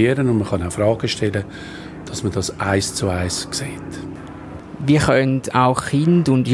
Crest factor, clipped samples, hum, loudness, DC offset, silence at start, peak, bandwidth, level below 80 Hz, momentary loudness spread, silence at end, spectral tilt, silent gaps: 18 dB; under 0.1%; none; -19 LUFS; under 0.1%; 0 s; -2 dBFS; 12 kHz; -46 dBFS; 17 LU; 0 s; -5.5 dB/octave; none